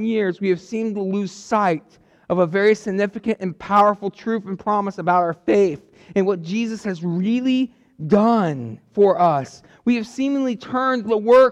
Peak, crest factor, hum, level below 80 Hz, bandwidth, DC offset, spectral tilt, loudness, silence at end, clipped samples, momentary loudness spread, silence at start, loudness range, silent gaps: -6 dBFS; 14 dB; none; -60 dBFS; 10 kHz; under 0.1%; -7 dB/octave; -20 LUFS; 0 s; under 0.1%; 10 LU; 0 s; 2 LU; none